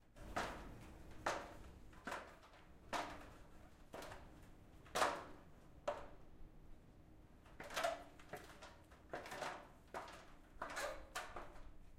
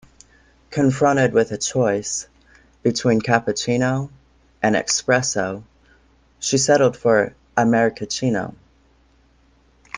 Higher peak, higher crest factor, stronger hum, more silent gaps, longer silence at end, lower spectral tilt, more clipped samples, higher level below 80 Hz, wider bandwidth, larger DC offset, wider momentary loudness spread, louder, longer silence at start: second, -22 dBFS vs -2 dBFS; first, 28 dB vs 20 dB; neither; neither; about the same, 0 s vs 0 s; second, -3 dB/octave vs -4.5 dB/octave; neither; second, -62 dBFS vs -54 dBFS; first, 16 kHz vs 10.5 kHz; neither; first, 21 LU vs 10 LU; second, -48 LUFS vs -20 LUFS; second, 0 s vs 0.7 s